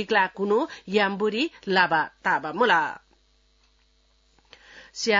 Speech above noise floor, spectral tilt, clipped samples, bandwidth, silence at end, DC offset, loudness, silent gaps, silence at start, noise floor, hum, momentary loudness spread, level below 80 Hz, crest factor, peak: 40 dB; -4 dB/octave; under 0.1%; 7.6 kHz; 0 s; under 0.1%; -24 LUFS; none; 0 s; -63 dBFS; none; 9 LU; -66 dBFS; 20 dB; -6 dBFS